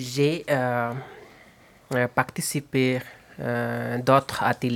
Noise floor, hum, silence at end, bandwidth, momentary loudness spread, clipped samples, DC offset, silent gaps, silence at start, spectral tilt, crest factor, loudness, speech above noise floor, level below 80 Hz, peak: -53 dBFS; none; 0 s; 18 kHz; 11 LU; under 0.1%; under 0.1%; none; 0 s; -5 dB/octave; 22 dB; -25 LUFS; 29 dB; -60 dBFS; -4 dBFS